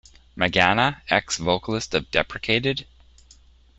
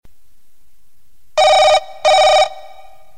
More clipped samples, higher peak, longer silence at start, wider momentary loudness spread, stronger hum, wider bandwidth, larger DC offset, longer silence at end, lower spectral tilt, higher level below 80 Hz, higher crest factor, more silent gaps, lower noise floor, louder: neither; about the same, -2 dBFS vs 0 dBFS; first, 0.35 s vs 0 s; about the same, 7 LU vs 7 LU; neither; second, 8.2 kHz vs 15.5 kHz; second, under 0.1% vs 2%; first, 0.95 s vs 0.6 s; first, -4 dB/octave vs 0.5 dB/octave; about the same, -48 dBFS vs -50 dBFS; first, 24 dB vs 14 dB; neither; second, -53 dBFS vs -58 dBFS; second, -22 LUFS vs -12 LUFS